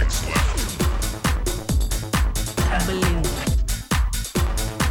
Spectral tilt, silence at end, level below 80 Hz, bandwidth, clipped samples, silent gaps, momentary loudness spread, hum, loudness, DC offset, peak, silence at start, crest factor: -4 dB/octave; 0 s; -24 dBFS; 19.5 kHz; under 0.1%; none; 3 LU; none; -23 LUFS; 0.2%; -8 dBFS; 0 s; 14 dB